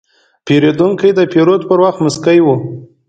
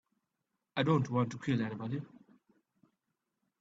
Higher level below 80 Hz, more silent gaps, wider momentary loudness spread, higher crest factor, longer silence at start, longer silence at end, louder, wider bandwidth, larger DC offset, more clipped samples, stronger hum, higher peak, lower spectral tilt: first, -54 dBFS vs -72 dBFS; neither; second, 6 LU vs 11 LU; second, 12 dB vs 22 dB; second, 0.45 s vs 0.75 s; second, 0.25 s vs 1.55 s; first, -11 LUFS vs -34 LUFS; first, 9.2 kHz vs 7.8 kHz; neither; neither; neither; first, 0 dBFS vs -14 dBFS; about the same, -6.5 dB/octave vs -7.5 dB/octave